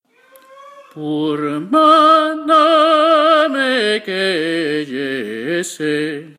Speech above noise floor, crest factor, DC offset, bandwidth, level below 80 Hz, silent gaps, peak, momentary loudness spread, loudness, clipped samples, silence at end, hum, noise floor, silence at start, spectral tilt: 33 dB; 14 dB; under 0.1%; 15 kHz; -66 dBFS; none; 0 dBFS; 11 LU; -14 LUFS; under 0.1%; 0.1 s; none; -48 dBFS; 0.55 s; -4 dB/octave